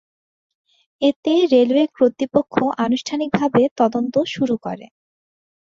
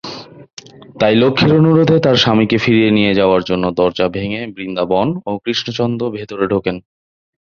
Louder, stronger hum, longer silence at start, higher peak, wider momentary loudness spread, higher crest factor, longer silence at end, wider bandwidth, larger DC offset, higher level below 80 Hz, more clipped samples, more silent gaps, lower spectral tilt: second, -18 LUFS vs -14 LUFS; neither; first, 1 s vs 0.05 s; about the same, -2 dBFS vs 0 dBFS; second, 7 LU vs 12 LU; about the same, 18 dB vs 14 dB; about the same, 0.9 s vs 0.8 s; about the same, 7.6 kHz vs 7.2 kHz; neither; second, -60 dBFS vs -46 dBFS; neither; first, 1.16-1.23 s, 3.71-3.76 s vs 0.53-0.57 s; about the same, -6 dB/octave vs -6.5 dB/octave